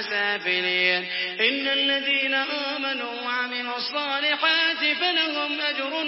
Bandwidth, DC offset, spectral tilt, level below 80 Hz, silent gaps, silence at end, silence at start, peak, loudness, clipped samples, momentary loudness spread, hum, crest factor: 5.8 kHz; under 0.1%; -5.5 dB/octave; -88 dBFS; none; 0 s; 0 s; -6 dBFS; -23 LUFS; under 0.1%; 7 LU; none; 18 dB